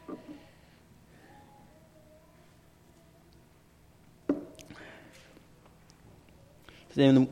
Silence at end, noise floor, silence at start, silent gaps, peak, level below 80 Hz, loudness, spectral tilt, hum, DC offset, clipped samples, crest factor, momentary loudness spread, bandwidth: 0 s; -60 dBFS; 0.1 s; none; -10 dBFS; -66 dBFS; -29 LUFS; -7.5 dB/octave; none; under 0.1%; under 0.1%; 24 dB; 32 LU; 10 kHz